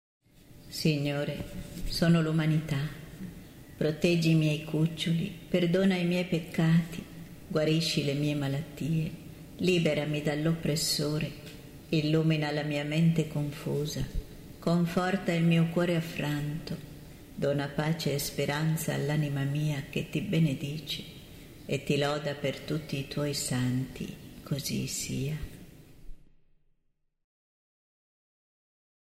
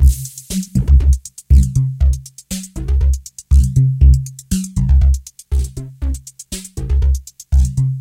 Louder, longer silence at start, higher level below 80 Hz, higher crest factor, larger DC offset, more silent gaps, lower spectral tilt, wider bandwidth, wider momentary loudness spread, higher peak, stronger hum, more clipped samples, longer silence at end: second, -30 LUFS vs -17 LUFS; first, 0.5 s vs 0 s; second, -50 dBFS vs -16 dBFS; about the same, 18 dB vs 14 dB; neither; neither; about the same, -5.5 dB/octave vs -6.5 dB/octave; about the same, 16 kHz vs 15 kHz; about the same, 15 LU vs 13 LU; second, -12 dBFS vs 0 dBFS; neither; neither; first, 3 s vs 0 s